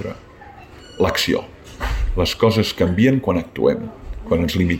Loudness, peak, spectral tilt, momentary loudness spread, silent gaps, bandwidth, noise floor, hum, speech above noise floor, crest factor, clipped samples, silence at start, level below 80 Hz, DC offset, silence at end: -19 LUFS; -4 dBFS; -5.5 dB/octave; 17 LU; none; 16.5 kHz; -41 dBFS; none; 22 dB; 16 dB; under 0.1%; 0 s; -30 dBFS; under 0.1%; 0 s